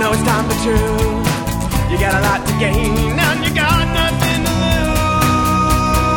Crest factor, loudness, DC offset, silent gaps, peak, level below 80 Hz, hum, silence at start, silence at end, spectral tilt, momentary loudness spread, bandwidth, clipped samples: 14 dB; -15 LUFS; under 0.1%; none; 0 dBFS; -24 dBFS; none; 0 s; 0 s; -5 dB/octave; 3 LU; 19 kHz; under 0.1%